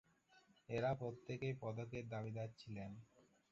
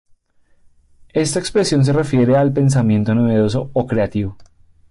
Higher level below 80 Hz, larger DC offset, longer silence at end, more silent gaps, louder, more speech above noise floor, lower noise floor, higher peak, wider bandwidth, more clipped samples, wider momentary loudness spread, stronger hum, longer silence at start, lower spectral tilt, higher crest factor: second, -72 dBFS vs -44 dBFS; neither; second, 0.3 s vs 0.45 s; neither; second, -47 LUFS vs -16 LUFS; second, 27 dB vs 39 dB; first, -73 dBFS vs -55 dBFS; second, -30 dBFS vs -6 dBFS; second, 7.4 kHz vs 11.5 kHz; neither; first, 11 LU vs 7 LU; neither; second, 0.3 s vs 1.15 s; about the same, -6.5 dB/octave vs -6.5 dB/octave; first, 18 dB vs 12 dB